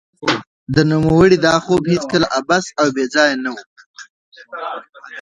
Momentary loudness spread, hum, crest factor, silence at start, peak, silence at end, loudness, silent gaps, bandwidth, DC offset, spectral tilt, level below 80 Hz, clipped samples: 17 LU; none; 16 dB; 0.2 s; 0 dBFS; 0 s; -15 LUFS; 0.47-0.66 s, 3.66-3.76 s, 3.86-3.94 s, 4.10-4.32 s, 4.89-4.93 s; 10.5 kHz; under 0.1%; -5.5 dB/octave; -44 dBFS; under 0.1%